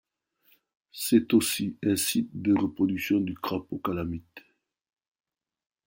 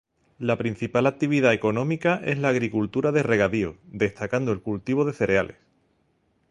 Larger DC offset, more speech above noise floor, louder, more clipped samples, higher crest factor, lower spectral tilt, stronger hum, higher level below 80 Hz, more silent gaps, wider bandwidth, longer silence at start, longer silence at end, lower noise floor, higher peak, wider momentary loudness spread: neither; second, 40 dB vs 44 dB; second, -27 LUFS vs -24 LUFS; neither; about the same, 20 dB vs 18 dB; second, -4.5 dB/octave vs -7 dB/octave; neither; second, -62 dBFS vs -54 dBFS; neither; first, 16.5 kHz vs 11 kHz; first, 0.95 s vs 0.4 s; first, 1.5 s vs 1 s; about the same, -67 dBFS vs -68 dBFS; second, -10 dBFS vs -6 dBFS; first, 10 LU vs 6 LU